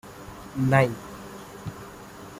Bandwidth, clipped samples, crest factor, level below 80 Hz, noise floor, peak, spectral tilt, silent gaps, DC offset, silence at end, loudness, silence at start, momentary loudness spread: 16 kHz; under 0.1%; 22 dB; -54 dBFS; -43 dBFS; -6 dBFS; -7 dB/octave; none; under 0.1%; 0 s; -24 LUFS; 0.05 s; 21 LU